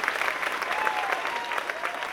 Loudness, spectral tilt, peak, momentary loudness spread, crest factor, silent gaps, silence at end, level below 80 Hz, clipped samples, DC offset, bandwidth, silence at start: -28 LUFS; -1 dB/octave; -6 dBFS; 4 LU; 22 dB; none; 0 s; -66 dBFS; under 0.1%; under 0.1%; 19 kHz; 0 s